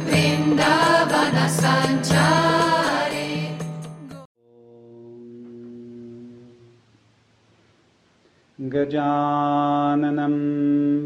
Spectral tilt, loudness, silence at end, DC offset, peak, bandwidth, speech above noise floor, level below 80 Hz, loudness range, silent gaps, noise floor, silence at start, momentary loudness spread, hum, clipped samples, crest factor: -5 dB/octave; -20 LUFS; 0 s; under 0.1%; -4 dBFS; 15.5 kHz; 39 dB; -58 dBFS; 25 LU; 4.25-4.35 s; -60 dBFS; 0 s; 23 LU; none; under 0.1%; 18 dB